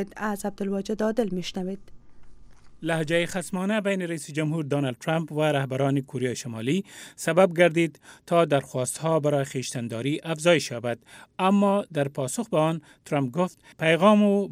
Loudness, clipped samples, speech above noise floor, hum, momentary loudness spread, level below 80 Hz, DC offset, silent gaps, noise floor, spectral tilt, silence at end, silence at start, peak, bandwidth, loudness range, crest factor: -25 LUFS; under 0.1%; 20 dB; none; 10 LU; -60 dBFS; under 0.1%; none; -45 dBFS; -5.5 dB/octave; 0 s; 0 s; -4 dBFS; 15.5 kHz; 5 LU; 22 dB